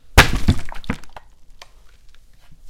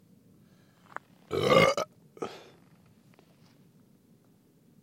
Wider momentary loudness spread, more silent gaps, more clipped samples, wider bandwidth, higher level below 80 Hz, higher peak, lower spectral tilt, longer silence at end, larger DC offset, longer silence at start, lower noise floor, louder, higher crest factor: second, 17 LU vs 24 LU; neither; first, 0.1% vs under 0.1%; about the same, 17 kHz vs 16.5 kHz; first, -26 dBFS vs -66 dBFS; first, 0 dBFS vs -6 dBFS; about the same, -4 dB/octave vs -4.5 dB/octave; second, 0 s vs 2.45 s; neither; second, 0.1 s vs 1.3 s; second, -43 dBFS vs -63 dBFS; first, -19 LUFS vs -27 LUFS; second, 20 dB vs 26 dB